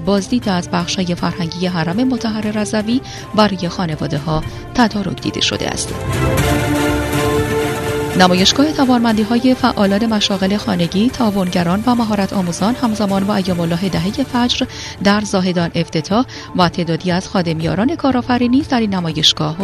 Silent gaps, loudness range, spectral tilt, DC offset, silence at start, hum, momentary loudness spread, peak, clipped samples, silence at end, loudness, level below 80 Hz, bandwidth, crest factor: none; 4 LU; -5 dB/octave; under 0.1%; 0 s; none; 6 LU; 0 dBFS; under 0.1%; 0 s; -16 LUFS; -36 dBFS; 14 kHz; 16 dB